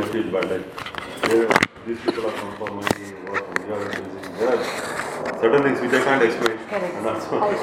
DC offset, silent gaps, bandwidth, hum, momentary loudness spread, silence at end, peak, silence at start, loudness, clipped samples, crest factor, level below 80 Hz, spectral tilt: under 0.1%; none; 17 kHz; none; 11 LU; 0 s; 0 dBFS; 0 s; -23 LUFS; under 0.1%; 22 dB; -56 dBFS; -4.5 dB/octave